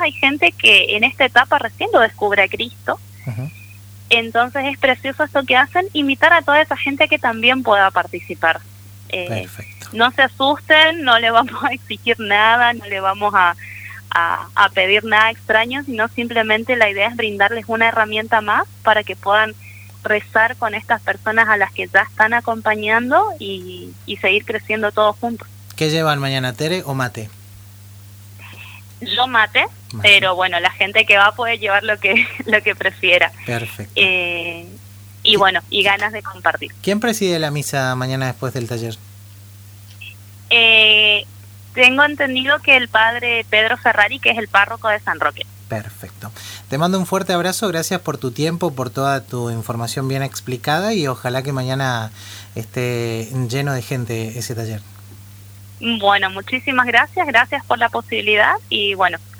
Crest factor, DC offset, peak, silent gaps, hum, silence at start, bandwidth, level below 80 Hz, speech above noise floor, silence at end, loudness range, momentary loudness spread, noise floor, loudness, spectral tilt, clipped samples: 18 dB; under 0.1%; 0 dBFS; none; 50 Hz at -40 dBFS; 0 s; over 20 kHz; -58 dBFS; 23 dB; 0 s; 8 LU; 15 LU; -40 dBFS; -15 LUFS; -4 dB/octave; under 0.1%